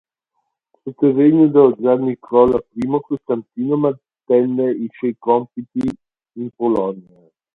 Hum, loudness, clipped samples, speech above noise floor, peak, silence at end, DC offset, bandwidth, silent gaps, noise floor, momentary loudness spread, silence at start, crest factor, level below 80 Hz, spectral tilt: none; -17 LUFS; under 0.1%; 57 dB; 0 dBFS; 0.55 s; under 0.1%; 4.3 kHz; none; -73 dBFS; 14 LU; 0.85 s; 18 dB; -54 dBFS; -10 dB/octave